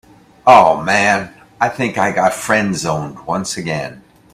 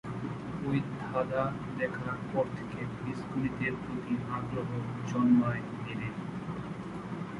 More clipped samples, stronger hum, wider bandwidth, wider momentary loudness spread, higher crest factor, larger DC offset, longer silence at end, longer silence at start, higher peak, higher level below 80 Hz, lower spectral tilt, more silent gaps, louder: first, 0.2% vs under 0.1%; neither; first, 15.5 kHz vs 11 kHz; first, 13 LU vs 10 LU; about the same, 16 dB vs 18 dB; neither; first, 0.35 s vs 0 s; first, 0.45 s vs 0.05 s; first, 0 dBFS vs -14 dBFS; first, -50 dBFS vs -58 dBFS; second, -4.5 dB/octave vs -8 dB/octave; neither; first, -15 LUFS vs -34 LUFS